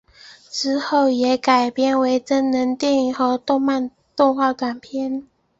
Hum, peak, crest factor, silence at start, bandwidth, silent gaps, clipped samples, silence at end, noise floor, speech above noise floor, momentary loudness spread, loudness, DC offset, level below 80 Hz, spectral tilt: none; -4 dBFS; 16 dB; 0.25 s; 8 kHz; none; under 0.1%; 0.35 s; -46 dBFS; 28 dB; 9 LU; -19 LUFS; under 0.1%; -64 dBFS; -3.5 dB/octave